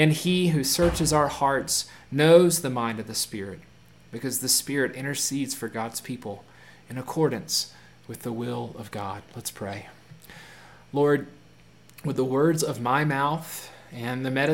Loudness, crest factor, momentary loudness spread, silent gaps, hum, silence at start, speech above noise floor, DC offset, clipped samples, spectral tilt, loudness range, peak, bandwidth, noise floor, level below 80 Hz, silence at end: -25 LUFS; 22 dB; 16 LU; none; none; 0 s; 29 dB; 0.1%; under 0.1%; -4 dB/octave; 8 LU; -4 dBFS; 17 kHz; -54 dBFS; -50 dBFS; 0 s